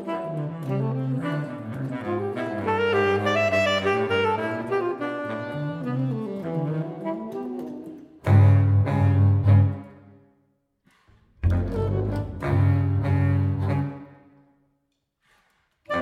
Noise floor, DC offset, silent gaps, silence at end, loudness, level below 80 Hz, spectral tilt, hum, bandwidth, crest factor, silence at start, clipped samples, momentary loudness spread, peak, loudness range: -74 dBFS; under 0.1%; none; 0 s; -24 LUFS; -44 dBFS; -8 dB/octave; none; 7.4 kHz; 18 dB; 0 s; under 0.1%; 13 LU; -6 dBFS; 7 LU